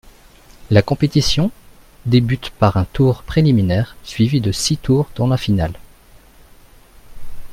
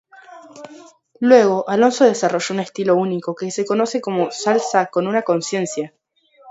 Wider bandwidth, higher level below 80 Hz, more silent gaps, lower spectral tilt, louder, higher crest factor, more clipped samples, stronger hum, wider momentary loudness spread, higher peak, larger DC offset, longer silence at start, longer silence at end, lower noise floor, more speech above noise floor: first, 16 kHz vs 8 kHz; first, -36 dBFS vs -70 dBFS; neither; first, -6 dB/octave vs -4.5 dB/octave; about the same, -17 LUFS vs -18 LUFS; about the same, 18 dB vs 18 dB; neither; neither; second, 7 LU vs 12 LU; about the same, 0 dBFS vs 0 dBFS; neither; first, 0.6 s vs 0.3 s; about the same, 0 s vs 0 s; second, -45 dBFS vs -50 dBFS; about the same, 30 dB vs 33 dB